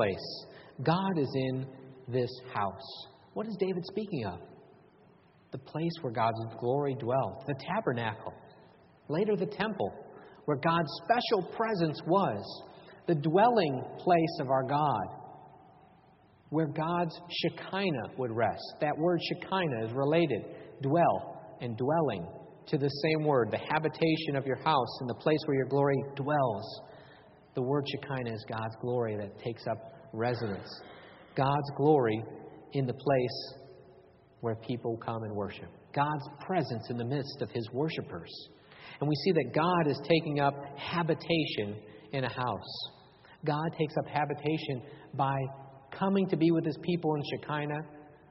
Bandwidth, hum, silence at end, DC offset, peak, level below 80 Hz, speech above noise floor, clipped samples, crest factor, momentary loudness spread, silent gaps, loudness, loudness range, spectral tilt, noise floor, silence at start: 5.8 kHz; none; 0.15 s; under 0.1%; -12 dBFS; -68 dBFS; 30 dB; under 0.1%; 20 dB; 15 LU; none; -32 LUFS; 6 LU; -5 dB/octave; -61 dBFS; 0 s